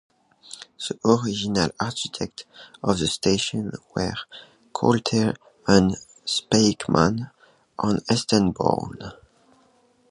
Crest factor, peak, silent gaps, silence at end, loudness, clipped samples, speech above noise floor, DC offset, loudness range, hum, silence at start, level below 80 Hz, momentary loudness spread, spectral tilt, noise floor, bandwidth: 22 dB; -2 dBFS; none; 0.95 s; -23 LUFS; under 0.1%; 38 dB; under 0.1%; 4 LU; none; 0.5 s; -50 dBFS; 20 LU; -5 dB/octave; -60 dBFS; 11.5 kHz